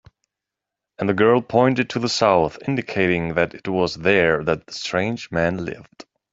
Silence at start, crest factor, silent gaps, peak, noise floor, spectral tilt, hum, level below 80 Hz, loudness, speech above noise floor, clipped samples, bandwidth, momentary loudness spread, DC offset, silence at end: 1 s; 18 dB; none; -2 dBFS; -85 dBFS; -5.5 dB/octave; none; -52 dBFS; -20 LUFS; 65 dB; under 0.1%; 8 kHz; 9 LU; under 0.1%; 0.3 s